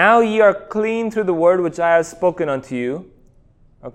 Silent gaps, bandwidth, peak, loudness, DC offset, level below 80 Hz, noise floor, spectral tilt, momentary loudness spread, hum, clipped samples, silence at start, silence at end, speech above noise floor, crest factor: none; 11.5 kHz; 0 dBFS; -17 LUFS; under 0.1%; -54 dBFS; -51 dBFS; -5.5 dB/octave; 11 LU; none; under 0.1%; 0 s; 0.05 s; 35 dB; 18 dB